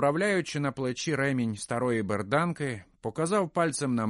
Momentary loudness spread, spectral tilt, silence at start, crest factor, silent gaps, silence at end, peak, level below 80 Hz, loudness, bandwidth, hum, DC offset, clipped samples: 6 LU; -5.5 dB/octave; 0 s; 16 dB; none; 0 s; -12 dBFS; -64 dBFS; -29 LUFS; 11.5 kHz; none; under 0.1%; under 0.1%